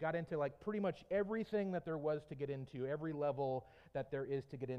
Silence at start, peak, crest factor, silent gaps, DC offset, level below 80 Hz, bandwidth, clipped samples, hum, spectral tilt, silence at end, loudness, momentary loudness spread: 0 s; -26 dBFS; 16 dB; none; under 0.1%; -72 dBFS; 8.6 kHz; under 0.1%; none; -8.5 dB/octave; 0 s; -41 LUFS; 6 LU